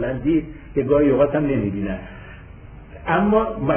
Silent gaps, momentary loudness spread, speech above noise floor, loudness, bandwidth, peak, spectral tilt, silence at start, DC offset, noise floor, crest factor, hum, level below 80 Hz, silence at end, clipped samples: none; 16 LU; 21 dB; -20 LUFS; 3.5 kHz; -6 dBFS; -11.5 dB/octave; 0 s; under 0.1%; -40 dBFS; 14 dB; none; -38 dBFS; 0 s; under 0.1%